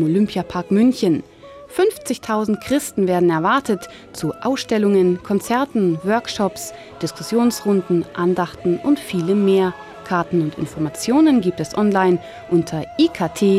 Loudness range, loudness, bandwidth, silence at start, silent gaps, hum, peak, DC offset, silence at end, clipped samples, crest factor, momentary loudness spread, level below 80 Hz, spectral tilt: 2 LU; -19 LUFS; 16 kHz; 0 s; none; none; -4 dBFS; under 0.1%; 0 s; under 0.1%; 14 dB; 9 LU; -54 dBFS; -6 dB/octave